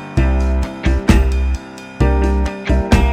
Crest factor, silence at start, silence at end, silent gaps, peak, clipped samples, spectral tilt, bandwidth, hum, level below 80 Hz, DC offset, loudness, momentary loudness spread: 14 dB; 0 s; 0 s; none; 0 dBFS; under 0.1%; -7 dB/octave; 11 kHz; none; -16 dBFS; under 0.1%; -17 LUFS; 7 LU